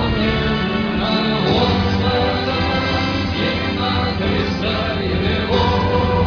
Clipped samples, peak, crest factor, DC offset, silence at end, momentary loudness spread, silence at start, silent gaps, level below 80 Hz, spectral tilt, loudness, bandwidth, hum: under 0.1%; -4 dBFS; 14 dB; under 0.1%; 0 s; 3 LU; 0 s; none; -30 dBFS; -7 dB/octave; -18 LUFS; 5.4 kHz; none